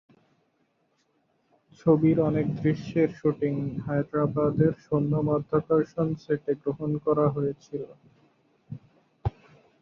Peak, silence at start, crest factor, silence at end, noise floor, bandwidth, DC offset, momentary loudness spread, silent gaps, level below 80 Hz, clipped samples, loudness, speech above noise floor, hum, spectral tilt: -8 dBFS; 1.85 s; 20 dB; 0.5 s; -71 dBFS; 6.8 kHz; under 0.1%; 13 LU; none; -54 dBFS; under 0.1%; -26 LUFS; 46 dB; none; -10 dB/octave